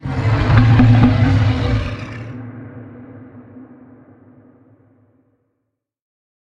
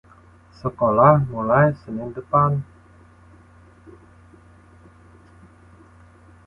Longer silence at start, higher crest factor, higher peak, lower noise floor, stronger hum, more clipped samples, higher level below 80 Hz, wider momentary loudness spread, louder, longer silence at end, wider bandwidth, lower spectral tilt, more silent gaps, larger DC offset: second, 0.05 s vs 0.65 s; about the same, 18 dB vs 22 dB; about the same, 0 dBFS vs -2 dBFS; first, -75 dBFS vs -50 dBFS; neither; neither; first, -30 dBFS vs -50 dBFS; first, 26 LU vs 16 LU; first, -14 LUFS vs -19 LUFS; second, 2.8 s vs 3.85 s; first, 7 kHz vs 5.6 kHz; second, -8.5 dB/octave vs -10.5 dB/octave; neither; neither